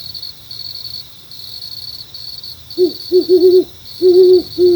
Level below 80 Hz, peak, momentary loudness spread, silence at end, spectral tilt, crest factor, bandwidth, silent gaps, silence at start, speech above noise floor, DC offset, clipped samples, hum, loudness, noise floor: -52 dBFS; 0 dBFS; 19 LU; 0 s; -6 dB/octave; 14 dB; over 20 kHz; none; 0 s; 23 dB; under 0.1%; under 0.1%; none; -12 LUFS; -33 dBFS